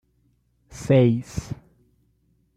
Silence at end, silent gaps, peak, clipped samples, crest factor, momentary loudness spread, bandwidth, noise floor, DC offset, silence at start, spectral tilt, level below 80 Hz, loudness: 1 s; none; -6 dBFS; under 0.1%; 18 dB; 21 LU; 11.5 kHz; -66 dBFS; under 0.1%; 0.7 s; -7.5 dB/octave; -50 dBFS; -21 LUFS